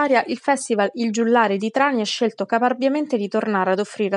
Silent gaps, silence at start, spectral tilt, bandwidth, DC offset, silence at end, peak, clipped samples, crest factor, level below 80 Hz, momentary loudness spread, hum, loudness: none; 0 s; -4.5 dB/octave; 11 kHz; under 0.1%; 0 s; -4 dBFS; under 0.1%; 16 dB; -84 dBFS; 4 LU; none; -20 LUFS